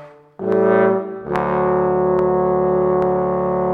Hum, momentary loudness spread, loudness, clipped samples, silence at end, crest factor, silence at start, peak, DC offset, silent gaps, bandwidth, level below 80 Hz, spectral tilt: none; 6 LU; -18 LUFS; under 0.1%; 0 s; 16 dB; 0 s; -2 dBFS; under 0.1%; none; 4.3 kHz; -44 dBFS; -10 dB/octave